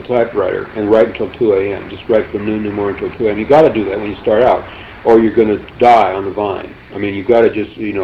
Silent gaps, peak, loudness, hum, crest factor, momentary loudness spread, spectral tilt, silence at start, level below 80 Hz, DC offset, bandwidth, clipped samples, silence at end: none; 0 dBFS; -14 LUFS; none; 12 dB; 11 LU; -8 dB/octave; 0 s; -42 dBFS; under 0.1%; 7.2 kHz; under 0.1%; 0 s